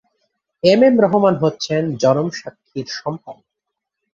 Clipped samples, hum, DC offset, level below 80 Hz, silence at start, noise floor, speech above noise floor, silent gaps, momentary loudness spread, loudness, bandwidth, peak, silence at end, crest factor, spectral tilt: under 0.1%; none; under 0.1%; -60 dBFS; 0.65 s; -80 dBFS; 63 dB; none; 18 LU; -16 LUFS; 7.6 kHz; 0 dBFS; 0.8 s; 18 dB; -6 dB/octave